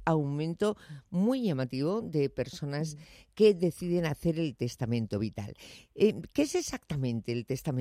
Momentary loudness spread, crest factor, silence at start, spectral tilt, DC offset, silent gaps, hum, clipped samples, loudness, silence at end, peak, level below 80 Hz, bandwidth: 11 LU; 18 dB; 0 s; -6.5 dB/octave; under 0.1%; none; none; under 0.1%; -31 LUFS; 0 s; -12 dBFS; -58 dBFS; 15.5 kHz